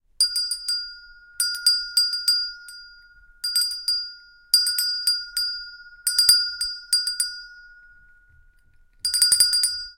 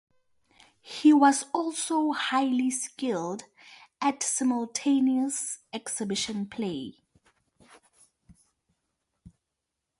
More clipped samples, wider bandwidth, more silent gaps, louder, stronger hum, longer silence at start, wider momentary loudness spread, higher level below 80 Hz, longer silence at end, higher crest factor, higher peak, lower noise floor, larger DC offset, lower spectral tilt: neither; first, 17 kHz vs 11.5 kHz; neither; first, -20 LUFS vs -27 LUFS; neither; second, 0.2 s vs 0.85 s; about the same, 15 LU vs 13 LU; first, -58 dBFS vs -72 dBFS; second, 0.05 s vs 1.65 s; about the same, 24 dB vs 20 dB; first, -2 dBFS vs -8 dBFS; second, -56 dBFS vs -84 dBFS; neither; second, 5 dB/octave vs -3 dB/octave